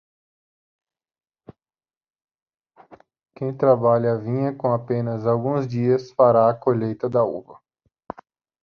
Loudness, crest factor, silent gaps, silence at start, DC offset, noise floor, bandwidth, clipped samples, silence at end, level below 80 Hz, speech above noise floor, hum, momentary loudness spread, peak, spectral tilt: -21 LUFS; 20 dB; none; 2.9 s; under 0.1%; under -90 dBFS; 6.6 kHz; under 0.1%; 1.1 s; -62 dBFS; over 70 dB; none; 16 LU; -4 dBFS; -10 dB/octave